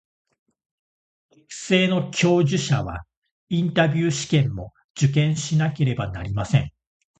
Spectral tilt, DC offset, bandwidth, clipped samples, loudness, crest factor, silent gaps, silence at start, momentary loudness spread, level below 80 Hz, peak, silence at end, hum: -5.5 dB/octave; under 0.1%; 9 kHz; under 0.1%; -22 LUFS; 20 dB; 3.17-3.22 s, 3.31-3.47 s, 4.84-4.94 s; 1.5 s; 16 LU; -46 dBFS; -2 dBFS; 0.5 s; none